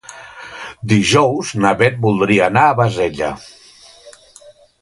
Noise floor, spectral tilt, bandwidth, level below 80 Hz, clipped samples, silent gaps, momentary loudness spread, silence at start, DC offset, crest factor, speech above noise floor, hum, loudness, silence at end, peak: -45 dBFS; -5.5 dB/octave; 11.5 kHz; -48 dBFS; under 0.1%; none; 20 LU; 0.1 s; under 0.1%; 16 dB; 30 dB; none; -14 LUFS; 0.7 s; 0 dBFS